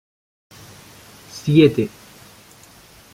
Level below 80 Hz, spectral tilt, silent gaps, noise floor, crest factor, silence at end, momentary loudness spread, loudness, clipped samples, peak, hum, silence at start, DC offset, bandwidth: -54 dBFS; -7 dB/octave; none; -47 dBFS; 20 dB; 1.25 s; 28 LU; -17 LUFS; under 0.1%; -2 dBFS; none; 1.35 s; under 0.1%; 16 kHz